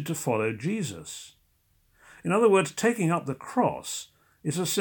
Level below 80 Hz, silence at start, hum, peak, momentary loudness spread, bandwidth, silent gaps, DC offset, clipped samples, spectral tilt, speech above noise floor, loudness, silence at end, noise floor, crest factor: -68 dBFS; 0 s; none; -10 dBFS; 16 LU; 18 kHz; none; under 0.1%; under 0.1%; -5 dB/octave; 41 dB; -27 LUFS; 0 s; -67 dBFS; 18 dB